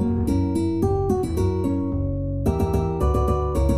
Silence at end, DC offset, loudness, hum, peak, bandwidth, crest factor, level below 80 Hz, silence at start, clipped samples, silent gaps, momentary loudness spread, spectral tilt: 0 s; 0.6%; -23 LUFS; none; -8 dBFS; 15 kHz; 14 dB; -28 dBFS; 0 s; under 0.1%; none; 3 LU; -9 dB/octave